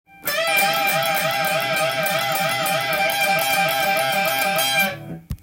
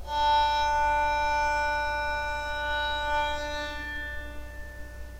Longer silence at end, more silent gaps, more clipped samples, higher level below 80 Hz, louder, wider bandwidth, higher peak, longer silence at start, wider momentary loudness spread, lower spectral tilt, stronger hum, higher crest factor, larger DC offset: about the same, 0.05 s vs 0 s; neither; neither; second, -50 dBFS vs -40 dBFS; first, -19 LUFS vs -27 LUFS; about the same, 17 kHz vs 16 kHz; first, -6 dBFS vs -16 dBFS; first, 0.2 s vs 0 s; second, 3 LU vs 18 LU; about the same, -2 dB/octave vs -3 dB/octave; neither; about the same, 14 dB vs 14 dB; neither